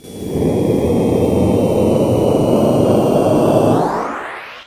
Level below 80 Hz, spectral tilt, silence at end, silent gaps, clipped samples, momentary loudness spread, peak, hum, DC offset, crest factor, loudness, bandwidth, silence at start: -34 dBFS; -7.5 dB/octave; 0.05 s; none; under 0.1%; 8 LU; 0 dBFS; none; under 0.1%; 14 dB; -14 LUFS; 16 kHz; 0.05 s